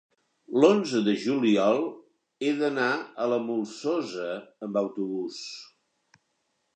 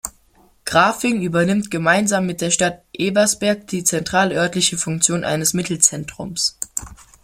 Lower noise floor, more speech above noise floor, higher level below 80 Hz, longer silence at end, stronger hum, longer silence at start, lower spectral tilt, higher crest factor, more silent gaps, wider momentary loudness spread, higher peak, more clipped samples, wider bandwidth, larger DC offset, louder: first, -76 dBFS vs -55 dBFS; first, 50 dB vs 36 dB; second, -82 dBFS vs -50 dBFS; first, 1.1 s vs 0.3 s; neither; first, 0.5 s vs 0.05 s; first, -5.5 dB/octave vs -3 dB/octave; about the same, 20 dB vs 20 dB; neither; first, 14 LU vs 10 LU; second, -6 dBFS vs 0 dBFS; neither; second, 9.4 kHz vs 16.5 kHz; neither; second, -27 LUFS vs -18 LUFS